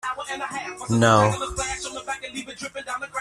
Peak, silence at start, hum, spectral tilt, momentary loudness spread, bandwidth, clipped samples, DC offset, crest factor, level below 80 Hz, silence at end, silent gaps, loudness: -2 dBFS; 0.05 s; none; -4.5 dB/octave; 16 LU; 13.5 kHz; under 0.1%; under 0.1%; 22 dB; -48 dBFS; 0 s; none; -24 LUFS